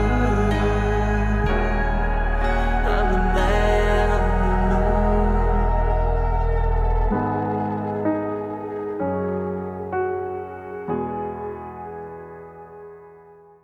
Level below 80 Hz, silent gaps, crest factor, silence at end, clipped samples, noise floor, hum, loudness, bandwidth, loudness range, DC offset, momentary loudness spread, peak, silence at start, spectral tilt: -24 dBFS; none; 12 dB; 0.45 s; under 0.1%; -48 dBFS; none; -23 LUFS; 7.8 kHz; 9 LU; under 0.1%; 14 LU; -8 dBFS; 0 s; -7.5 dB/octave